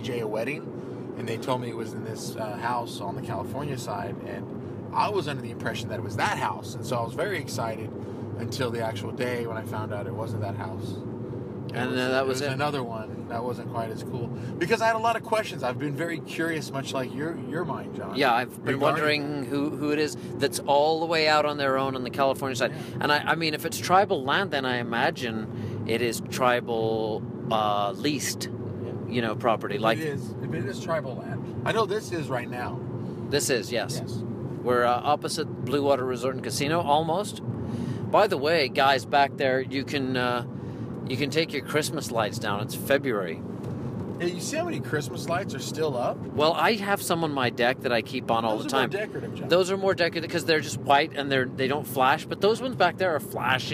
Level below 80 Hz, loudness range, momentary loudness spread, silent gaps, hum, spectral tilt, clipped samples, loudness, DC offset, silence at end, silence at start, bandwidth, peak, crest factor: -62 dBFS; 6 LU; 11 LU; none; none; -5 dB/octave; under 0.1%; -27 LUFS; under 0.1%; 0 s; 0 s; 15.5 kHz; -8 dBFS; 20 dB